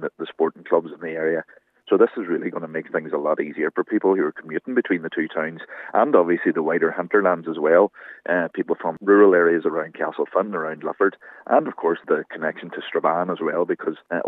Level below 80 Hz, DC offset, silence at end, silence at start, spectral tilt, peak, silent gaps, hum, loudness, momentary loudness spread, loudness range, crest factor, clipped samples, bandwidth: -84 dBFS; under 0.1%; 0 s; 0 s; -9 dB/octave; -2 dBFS; none; none; -22 LUFS; 10 LU; 5 LU; 20 dB; under 0.1%; 4 kHz